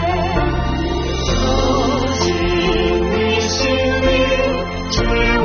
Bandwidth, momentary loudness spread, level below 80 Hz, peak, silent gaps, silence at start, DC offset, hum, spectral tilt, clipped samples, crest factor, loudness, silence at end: 6.8 kHz; 5 LU; -24 dBFS; -2 dBFS; none; 0 s; under 0.1%; none; -4 dB/octave; under 0.1%; 14 dB; -17 LUFS; 0 s